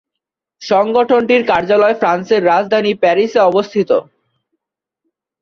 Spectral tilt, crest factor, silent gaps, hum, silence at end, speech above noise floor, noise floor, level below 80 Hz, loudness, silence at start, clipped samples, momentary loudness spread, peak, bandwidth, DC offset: -5.5 dB/octave; 14 dB; none; none; 1.4 s; 68 dB; -81 dBFS; -58 dBFS; -13 LUFS; 0.6 s; under 0.1%; 4 LU; 0 dBFS; 7 kHz; under 0.1%